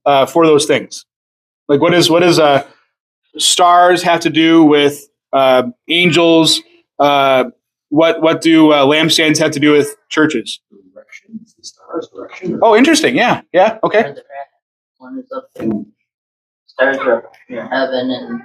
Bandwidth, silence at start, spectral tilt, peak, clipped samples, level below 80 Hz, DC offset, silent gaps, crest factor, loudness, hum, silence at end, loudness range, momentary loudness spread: 15 kHz; 0.05 s; -4 dB/octave; 0 dBFS; under 0.1%; -62 dBFS; under 0.1%; 1.16-1.66 s, 3.00-3.22 s, 14.62-14.95 s, 16.14-16.66 s; 14 dB; -12 LUFS; none; 0.05 s; 9 LU; 19 LU